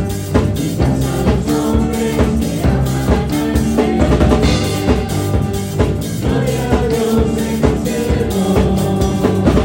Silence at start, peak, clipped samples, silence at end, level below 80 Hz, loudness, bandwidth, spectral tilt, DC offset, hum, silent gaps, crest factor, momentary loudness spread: 0 s; 0 dBFS; under 0.1%; 0 s; -22 dBFS; -15 LUFS; 16.5 kHz; -6.5 dB/octave; under 0.1%; none; none; 14 dB; 4 LU